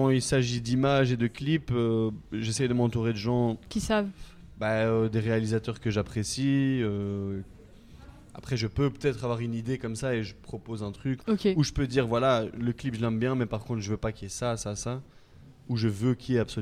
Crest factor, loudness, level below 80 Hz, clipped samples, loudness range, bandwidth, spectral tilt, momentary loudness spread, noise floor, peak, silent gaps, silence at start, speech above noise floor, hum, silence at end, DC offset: 18 dB; -29 LUFS; -50 dBFS; under 0.1%; 5 LU; 13.5 kHz; -6 dB/octave; 9 LU; -52 dBFS; -10 dBFS; none; 0 s; 25 dB; none; 0 s; under 0.1%